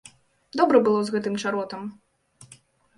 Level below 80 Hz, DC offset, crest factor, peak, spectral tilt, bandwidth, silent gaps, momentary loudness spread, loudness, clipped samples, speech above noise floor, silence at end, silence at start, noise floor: -70 dBFS; under 0.1%; 22 dB; -4 dBFS; -5.5 dB/octave; 11.5 kHz; none; 16 LU; -23 LUFS; under 0.1%; 32 dB; 1.05 s; 0.55 s; -55 dBFS